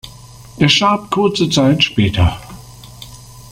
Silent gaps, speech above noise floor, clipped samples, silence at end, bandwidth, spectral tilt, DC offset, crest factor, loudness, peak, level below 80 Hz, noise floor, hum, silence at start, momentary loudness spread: none; 24 dB; under 0.1%; 0.1 s; 16 kHz; -5 dB/octave; under 0.1%; 16 dB; -14 LUFS; 0 dBFS; -36 dBFS; -37 dBFS; none; 0.05 s; 23 LU